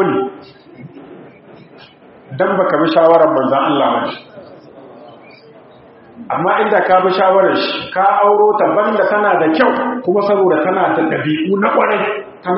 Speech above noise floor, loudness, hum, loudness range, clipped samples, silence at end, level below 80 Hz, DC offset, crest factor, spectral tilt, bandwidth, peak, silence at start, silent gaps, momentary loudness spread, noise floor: 28 dB; -13 LUFS; none; 6 LU; under 0.1%; 0 s; -62 dBFS; under 0.1%; 14 dB; -3.5 dB/octave; 5.8 kHz; 0 dBFS; 0 s; none; 8 LU; -41 dBFS